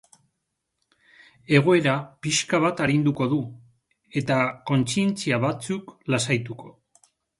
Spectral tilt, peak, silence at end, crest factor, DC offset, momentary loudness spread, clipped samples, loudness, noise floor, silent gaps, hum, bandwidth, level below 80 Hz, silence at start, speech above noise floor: -5 dB/octave; -4 dBFS; 0.7 s; 22 dB; under 0.1%; 11 LU; under 0.1%; -23 LUFS; -79 dBFS; none; none; 11.5 kHz; -62 dBFS; 1.5 s; 56 dB